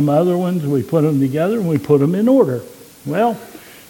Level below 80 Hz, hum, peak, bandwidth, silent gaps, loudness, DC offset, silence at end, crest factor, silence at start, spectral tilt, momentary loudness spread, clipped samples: -58 dBFS; none; 0 dBFS; 17.5 kHz; none; -16 LUFS; under 0.1%; 0.3 s; 16 dB; 0 s; -8.5 dB/octave; 12 LU; under 0.1%